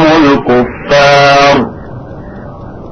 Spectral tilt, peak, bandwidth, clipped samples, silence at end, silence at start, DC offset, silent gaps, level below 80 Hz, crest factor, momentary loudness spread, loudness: -5 dB/octave; 0 dBFS; 9.2 kHz; 0.2%; 0 s; 0 s; under 0.1%; none; -32 dBFS; 8 dB; 22 LU; -7 LUFS